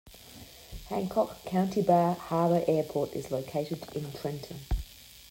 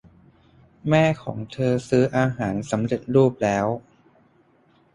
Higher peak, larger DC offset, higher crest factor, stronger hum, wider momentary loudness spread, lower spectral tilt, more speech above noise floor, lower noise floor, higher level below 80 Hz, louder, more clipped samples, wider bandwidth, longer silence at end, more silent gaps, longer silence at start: second, -10 dBFS vs -4 dBFS; neither; about the same, 20 dB vs 18 dB; neither; first, 21 LU vs 10 LU; about the same, -7 dB/octave vs -7 dB/octave; second, 21 dB vs 38 dB; second, -50 dBFS vs -59 dBFS; first, -44 dBFS vs -54 dBFS; second, -30 LUFS vs -22 LUFS; neither; first, 16.5 kHz vs 11 kHz; second, 0 s vs 1.15 s; neither; second, 0.05 s vs 0.85 s